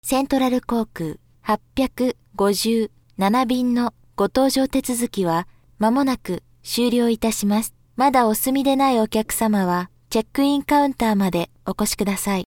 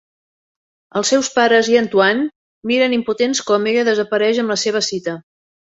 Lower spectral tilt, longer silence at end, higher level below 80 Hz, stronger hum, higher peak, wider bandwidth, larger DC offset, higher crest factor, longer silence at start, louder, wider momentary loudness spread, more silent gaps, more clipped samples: first, -4.5 dB/octave vs -3 dB/octave; second, 0.05 s vs 0.55 s; first, -48 dBFS vs -64 dBFS; neither; about the same, -4 dBFS vs -2 dBFS; first, 18 kHz vs 8 kHz; neither; about the same, 16 dB vs 16 dB; second, 0.05 s vs 0.95 s; second, -21 LUFS vs -16 LUFS; second, 8 LU vs 12 LU; second, none vs 2.36-2.62 s; neither